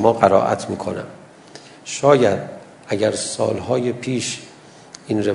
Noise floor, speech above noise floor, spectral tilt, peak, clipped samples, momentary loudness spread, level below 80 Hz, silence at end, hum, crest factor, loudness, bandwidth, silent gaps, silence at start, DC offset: -43 dBFS; 24 dB; -5 dB/octave; 0 dBFS; under 0.1%; 22 LU; -60 dBFS; 0 s; none; 20 dB; -19 LUFS; 11 kHz; none; 0 s; under 0.1%